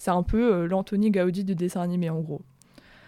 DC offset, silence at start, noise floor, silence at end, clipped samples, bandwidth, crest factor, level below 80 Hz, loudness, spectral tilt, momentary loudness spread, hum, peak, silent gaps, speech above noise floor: under 0.1%; 0 s; -54 dBFS; 0.65 s; under 0.1%; 14 kHz; 16 dB; -42 dBFS; -25 LUFS; -7.5 dB/octave; 8 LU; none; -10 dBFS; none; 29 dB